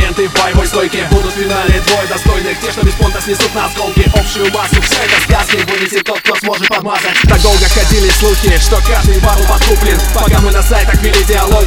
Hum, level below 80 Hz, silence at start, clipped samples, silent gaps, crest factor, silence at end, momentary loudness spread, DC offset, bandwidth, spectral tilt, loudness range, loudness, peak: none; -12 dBFS; 0 s; 0.8%; none; 10 dB; 0 s; 4 LU; under 0.1%; 18.5 kHz; -4 dB/octave; 3 LU; -10 LUFS; 0 dBFS